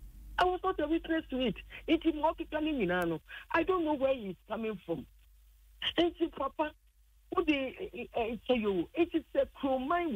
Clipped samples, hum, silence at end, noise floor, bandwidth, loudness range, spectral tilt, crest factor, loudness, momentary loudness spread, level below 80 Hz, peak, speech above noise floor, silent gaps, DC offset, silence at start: under 0.1%; none; 0 s; -63 dBFS; 16 kHz; 3 LU; -6.5 dB/octave; 16 dB; -33 LUFS; 8 LU; -54 dBFS; -18 dBFS; 31 dB; none; under 0.1%; 0 s